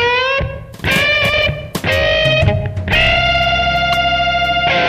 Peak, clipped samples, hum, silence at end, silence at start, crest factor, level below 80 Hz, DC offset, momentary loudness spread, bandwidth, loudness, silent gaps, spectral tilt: -4 dBFS; under 0.1%; none; 0 s; 0 s; 10 dB; -28 dBFS; under 0.1%; 7 LU; 15.5 kHz; -13 LUFS; none; -4.5 dB/octave